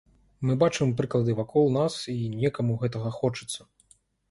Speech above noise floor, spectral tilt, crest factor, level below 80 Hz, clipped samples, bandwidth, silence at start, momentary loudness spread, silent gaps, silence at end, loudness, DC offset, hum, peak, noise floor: 37 dB; -6.5 dB/octave; 18 dB; -58 dBFS; under 0.1%; 11.5 kHz; 0.4 s; 8 LU; none; 0.7 s; -27 LUFS; under 0.1%; none; -8 dBFS; -63 dBFS